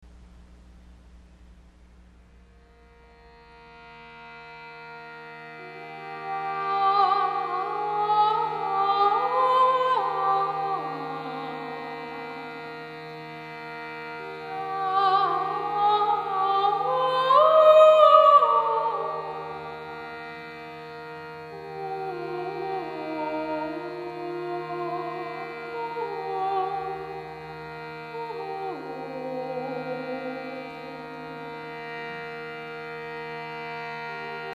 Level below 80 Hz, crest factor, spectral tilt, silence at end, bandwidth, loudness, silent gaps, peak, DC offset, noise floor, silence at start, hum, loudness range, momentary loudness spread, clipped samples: -62 dBFS; 24 dB; -5.5 dB/octave; 0 s; 10.5 kHz; -25 LUFS; none; -2 dBFS; under 0.1%; -54 dBFS; 0 s; none; 17 LU; 18 LU; under 0.1%